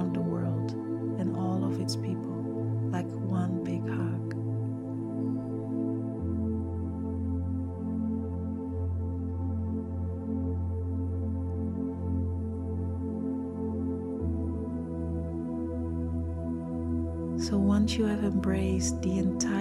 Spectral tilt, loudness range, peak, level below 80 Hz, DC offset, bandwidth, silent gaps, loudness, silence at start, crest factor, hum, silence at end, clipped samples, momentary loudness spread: -7 dB/octave; 4 LU; -14 dBFS; -44 dBFS; under 0.1%; 11.5 kHz; none; -32 LUFS; 0 s; 16 dB; none; 0 s; under 0.1%; 6 LU